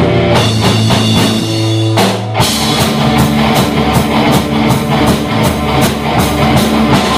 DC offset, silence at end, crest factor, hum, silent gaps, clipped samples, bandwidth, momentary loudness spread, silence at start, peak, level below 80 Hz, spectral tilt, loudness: under 0.1%; 0 s; 10 dB; none; none; under 0.1%; 16 kHz; 3 LU; 0 s; 0 dBFS; -26 dBFS; -5 dB/octave; -10 LUFS